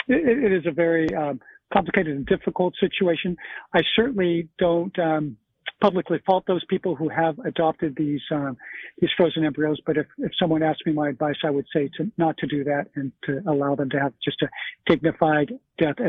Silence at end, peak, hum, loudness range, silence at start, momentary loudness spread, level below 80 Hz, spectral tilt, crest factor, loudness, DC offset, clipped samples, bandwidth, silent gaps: 0 s; -2 dBFS; none; 2 LU; 0.1 s; 7 LU; -56 dBFS; -8.5 dB/octave; 20 dB; -23 LUFS; under 0.1%; under 0.1%; 5.2 kHz; none